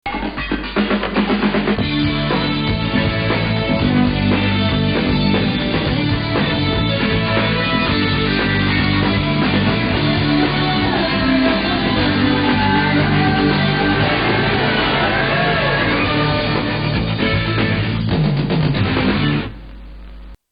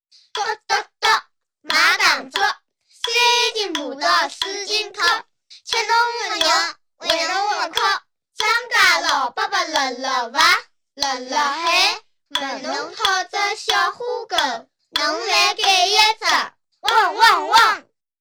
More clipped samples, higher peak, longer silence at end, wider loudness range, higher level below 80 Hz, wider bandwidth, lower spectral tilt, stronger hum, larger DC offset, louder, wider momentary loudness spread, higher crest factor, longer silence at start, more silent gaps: neither; about the same, -4 dBFS vs -2 dBFS; second, 0.15 s vs 0.4 s; about the same, 2 LU vs 3 LU; first, -32 dBFS vs -60 dBFS; second, 5.2 kHz vs over 20 kHz; first, -9.5 dB/octave vs 1 dB/octave; neither; neither; about the same, -16 LUFS vs -18 LUFS; second, 3 LU vs 11 LU; about the same, 14 dB vs 18 dB; second, 0.05 s vs 0.35 s; neither